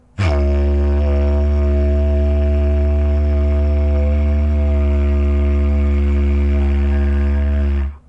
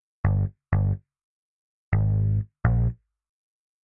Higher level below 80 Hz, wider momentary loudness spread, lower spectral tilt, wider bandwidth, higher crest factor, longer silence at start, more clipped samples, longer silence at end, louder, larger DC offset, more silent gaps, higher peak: first, -16 dBFS vs -34 dBFS; second, 1 LU vs 5 LU; second, -9.5 dB/octave vs -13.5 dB/octave; first, 5.6 kHz vs 2.8 kHz; second, 10 dB vs 20 dB; about the same, 0.2 s vs 0.25 s; neither; second, 0.1 s vs 0.9 s; first, -17 LUFS vs -26 LUFS; neither; second, none vs 1.23-1.92 s; about the same, -4 dBFS vs -6 dBFS